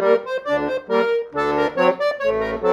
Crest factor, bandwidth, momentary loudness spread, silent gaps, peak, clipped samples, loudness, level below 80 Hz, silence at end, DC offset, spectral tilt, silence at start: 16 dB; 11.5 kHz; 4 LU; none; -4 dBFS; under 0.1%; -20 LUFS; -50 dBFS; 0 s; under 0.1%; -6 dB/octave; 0 s